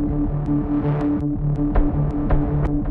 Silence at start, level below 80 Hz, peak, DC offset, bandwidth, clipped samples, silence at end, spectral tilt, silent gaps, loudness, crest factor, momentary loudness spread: 0 s; -24 dBFS; -6 dBFS; under 0.1%; 3.9 kHz; under 0.1%; 0 s; -11.5 dB/octave; none; -22 LUFS; 14 dB; 2 LU